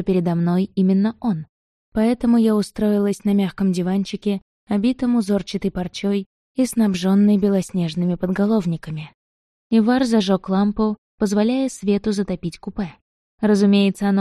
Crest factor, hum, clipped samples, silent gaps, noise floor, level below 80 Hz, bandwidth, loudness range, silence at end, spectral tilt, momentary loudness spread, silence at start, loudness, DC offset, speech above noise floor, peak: 14 dB; none; under 0.1%; 1.49-1.92 s, 4.42-4.67 s, 6.26-6.55 s, 9.14-9.70 s, 10.98-11.18 s, 13.01-13.38 s; under -90 dBFS; -48 dBFS; 12.5 kHz; 2 LU; 0 s; -7 dB/octave; 11 LU; 0 s; -20 LUFS; under 0.1%; over 71 dB; -4 dBFS